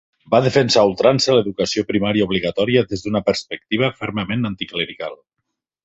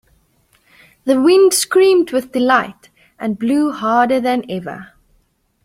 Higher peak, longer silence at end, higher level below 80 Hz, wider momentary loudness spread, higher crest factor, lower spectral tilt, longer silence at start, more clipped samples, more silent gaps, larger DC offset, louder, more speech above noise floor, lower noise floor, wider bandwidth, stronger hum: about the same, -2 dBFS vs -2 dBFS; about the same, 0.7 s vs 0.8 s; first, -50 dBFS vs -58 dBFS; second, 9 LU vs 15 LU; about the same, 18 dB vs 16 dB; first, -5 dB/octave vs -3.5 dB/octave; second, 0.3 s vs 1.05 s; neither; neither; neither; second, -18 LUFS vs -15 LUFS; first, 60 dB vs 46 dB; first, -78 dBFS vs -60 dBFS; second, 8 kHz vs 16 kHz; neither